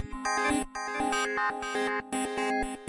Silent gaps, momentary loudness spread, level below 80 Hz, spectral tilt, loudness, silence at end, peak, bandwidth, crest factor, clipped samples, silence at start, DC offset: none; 4 LU; -50 dBFS; -2.5 dB/octave; -30 LUFS; 0 s; -16 dBFS; 11.5 kHz; 14 dB; under 0.1%; 0 s; under 0.1%